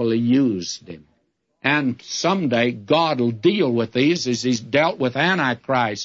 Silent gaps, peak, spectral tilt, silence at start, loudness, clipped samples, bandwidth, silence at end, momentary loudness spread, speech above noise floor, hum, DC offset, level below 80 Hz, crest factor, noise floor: none; -4 dBFS; -5 dB/octave; 0 s; -20 LUFS; under 0.1%; 7.8 kHz; 0 s; 5 LU; 47 dB; none; under 0.1%; -64 dBFS; 16 dB; -67 dBFS